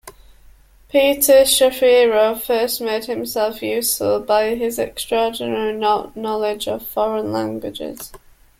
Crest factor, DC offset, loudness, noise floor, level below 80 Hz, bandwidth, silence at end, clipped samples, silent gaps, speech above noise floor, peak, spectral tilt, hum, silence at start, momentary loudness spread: 18 dB; under 0.1%; -18 LUFS; -47 dBFS; -50 dBFS; 16.5 kHz; 0.4 s; under 0.1%; none; 30 dB; -2 dBFS; -2.5 dB/octave; none; 0.05 s; 12 LU